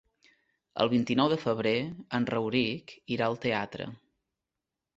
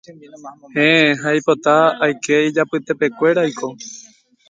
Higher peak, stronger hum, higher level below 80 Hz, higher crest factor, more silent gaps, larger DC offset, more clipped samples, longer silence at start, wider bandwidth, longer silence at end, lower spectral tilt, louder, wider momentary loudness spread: second, -10 dBFS vs 0 dBFS; neither; about the same, -66 dBFS vs -68 dBFS; about the same, 20 dB vs 18 dB; neither; neither; neither; first, 0.75 s vs 0.1 s; second, 7.8 kHz vs 9.2 kHz; first, 1 s vs 0.5 s; first, -6.5 dB/octave vs -4.5 dB/octave; second, -29 LUFS vs -16 LUFS; about the same, 13 LU vs 15 LU